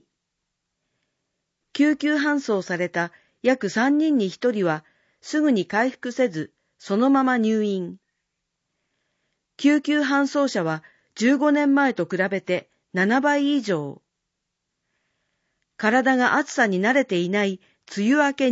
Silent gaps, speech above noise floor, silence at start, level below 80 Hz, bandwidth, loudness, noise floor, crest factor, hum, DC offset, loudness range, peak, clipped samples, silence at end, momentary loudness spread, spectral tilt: none; 59 dB; 1.75 s; -74 dBFS; 8 kHz; -22 LUFS; -80 dBFS; 18 dB; none; under 0.1%; 3 LU; -6 dBFS; under 0.1%; 0 s; 9 LU; -5.5 dB/octave